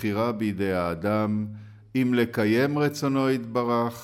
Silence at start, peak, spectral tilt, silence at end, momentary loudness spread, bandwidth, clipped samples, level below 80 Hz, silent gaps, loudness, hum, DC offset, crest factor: 0 s; -12 dBFS; -6.5 dB/octave; 0 s; 6 LU; 16.5 kHz; under 0.1%; -60 dBFS; none; -25 LUFS; none; under 0.1%; 14 dB